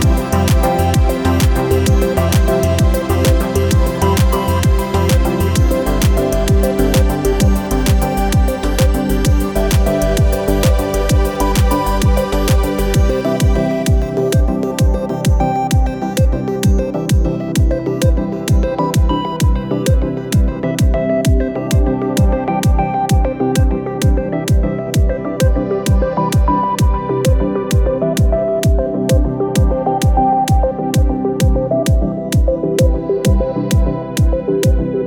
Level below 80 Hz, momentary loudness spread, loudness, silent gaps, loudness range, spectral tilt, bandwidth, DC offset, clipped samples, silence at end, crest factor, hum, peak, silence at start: -18 dBFS; 3 LU; -15 LUFS; none; 2 LU; -6.5 dB/octave; 20 kHz; under 0.1%; under 0.1%; 0 s; 12 dB; none; -2 dBFS; 0 s